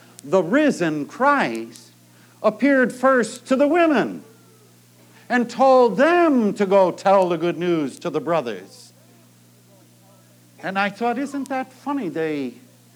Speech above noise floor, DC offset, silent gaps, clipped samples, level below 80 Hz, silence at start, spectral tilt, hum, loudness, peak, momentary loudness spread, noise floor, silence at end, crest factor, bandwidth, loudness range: 33 dB; under 0.1%; none; under 0.1%; -86 dBFS; 0.25 s; -5.5 dB/octave; 60 Hz at -50 dBFS; -20 LUFS; -4 dBFS; 12 LU; -52 dBFS; 0.45 s; 16 dB; 17.5 kHz; 10 LU